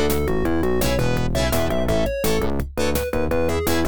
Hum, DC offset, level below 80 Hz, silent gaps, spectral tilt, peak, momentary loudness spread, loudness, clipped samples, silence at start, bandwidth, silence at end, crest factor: none; 4%; -30 dBFS; none; -5.5 dB/octave; -8 dBFS; 2 LU; -22 LUFS; under 0.1%; 0 s; over 20 kHz; 0 s; 14 dB